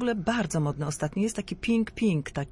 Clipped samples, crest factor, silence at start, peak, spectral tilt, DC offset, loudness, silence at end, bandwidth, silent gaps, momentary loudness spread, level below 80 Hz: under 0.1%; 14 dB; 0 s; -12 dBFS; -6 dB/octave; under 0.1%; -28 LUFS; 0 s; 11.5 kHz; none; 4 LU; -50 dBFS